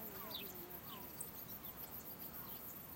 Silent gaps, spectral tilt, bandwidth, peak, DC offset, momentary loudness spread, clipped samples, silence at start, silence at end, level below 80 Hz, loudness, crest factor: none; -3 dB/octave; 16.5 kHz; -32 dBFS; under 0.1%; 3 LU; under 0.1%; 0 s; 0 s; -70 dBFS; -48 LUFS; 18 dB